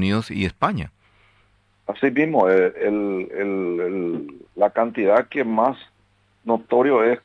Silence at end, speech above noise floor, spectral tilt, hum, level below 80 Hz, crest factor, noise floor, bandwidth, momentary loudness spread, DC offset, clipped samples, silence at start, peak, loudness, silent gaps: 0.05 s; 41 dB; -7.5 dB/octave; 50 Hz at -50 dBFS; -54 dBFS; 18 dB; -61 dBFS; 10.5 kHz; 14 LU; under 0.1%; under 0.1%; 0 s; -4 dBFS; -21 LUFS; none